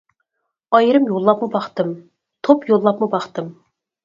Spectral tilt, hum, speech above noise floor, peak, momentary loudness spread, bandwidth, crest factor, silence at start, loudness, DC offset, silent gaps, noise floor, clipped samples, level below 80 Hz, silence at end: -7.5 dB/octave; none; 60 dB; 0 dBFS; 14 LU; 7.4 kHz; 18 dB; 0.7 s; -17 LUFS; under 0.1%; none; -76 dBFS; under 0.1%; -68 dBFS; 0.55 s